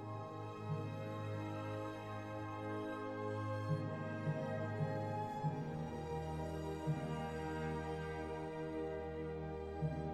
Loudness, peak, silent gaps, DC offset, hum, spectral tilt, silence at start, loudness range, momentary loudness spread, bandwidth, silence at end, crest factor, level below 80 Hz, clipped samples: -43 LUFS; -26 dBFS; none; under 0.1%; none; -7.5 dB/octave; 0 s; 2 LU; 5 LU; 12 kHz; 0 s; 16 dB; -58 dBFS; under 0.1%